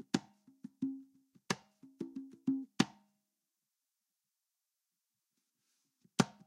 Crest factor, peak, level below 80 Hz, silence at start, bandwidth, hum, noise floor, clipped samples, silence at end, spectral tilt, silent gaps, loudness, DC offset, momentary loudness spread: 32 dB; -10 dBFS; -82 dBFS; 0.15 s; 15.5 kHz; none; -89 dBFS; under 0.1%; 0.15 s; -4.5 dB/octave; none; -40 LUFS; under 0.1%; 14 LU